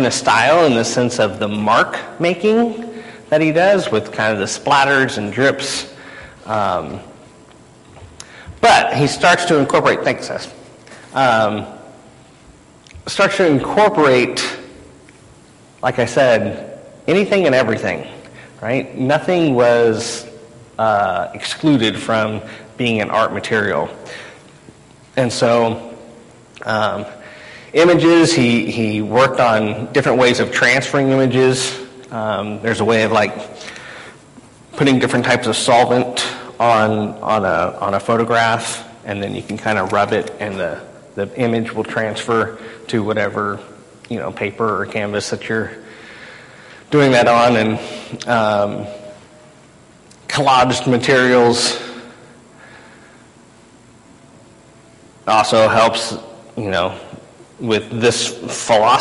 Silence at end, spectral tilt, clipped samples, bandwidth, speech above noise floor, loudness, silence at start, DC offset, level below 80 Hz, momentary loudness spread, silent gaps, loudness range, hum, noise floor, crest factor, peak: 0 s; -4.5 dB/octave; under 0.1%; 11.5 kHz; 30 dB; -16 LUFS; 0 s; under 0.1%; -50 dBFS; 19 LU; none; 6 LU; none; -46 dBFS; 14 dB; -2 dBFS